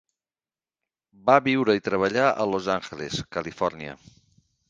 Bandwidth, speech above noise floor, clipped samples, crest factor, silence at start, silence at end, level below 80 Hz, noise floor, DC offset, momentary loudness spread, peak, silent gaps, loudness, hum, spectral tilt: 9.4 kHz; over 66 dB; under 0.1%; 24 dB; 1.25 s; 0.75 s; -60 dBFS; under -90 dBFS; under 0.1%; 12 LU; -2 dBFS; none; -24 LUFS; none; -5.5 dB/octave